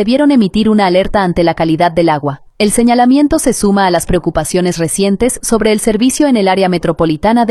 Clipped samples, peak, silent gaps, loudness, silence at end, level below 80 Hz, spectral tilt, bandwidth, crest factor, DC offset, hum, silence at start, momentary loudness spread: under 0.1%; 0 dBFS; none; -11 LUFS; 0 s; -32 dBFS; -5 dB/octave; 14 kHz; 10 dB; under 0.1%; none; 0 s; 5 LU